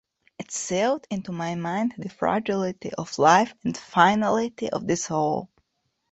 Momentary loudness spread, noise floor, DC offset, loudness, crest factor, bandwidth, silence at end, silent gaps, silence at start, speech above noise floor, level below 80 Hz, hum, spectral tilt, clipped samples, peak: 13 LU; -75 dBFS; under 0.1%; -24 LUFS; 22 dB; 8.2 kHz; 0.65 s; none; 0.4 s; 51 dB; -62 dBFS; none; -4.5 dB/octave; under 0.1%; -2 dBFS